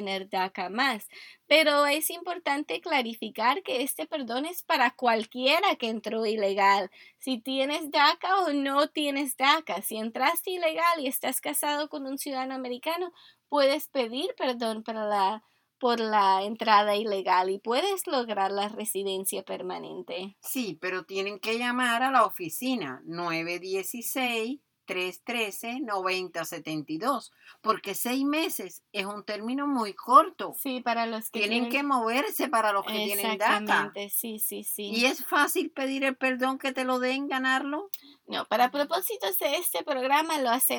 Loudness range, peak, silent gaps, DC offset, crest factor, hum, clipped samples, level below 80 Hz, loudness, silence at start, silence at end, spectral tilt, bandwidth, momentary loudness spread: 5 LU; -6 dBFS; none; under 0.1%; 22 dB; none; under 0.1%; -84 dBFS; -27 LUFS; 0 s; 0 s; -2.5 dB/octave; over 20 kHz; 11 LU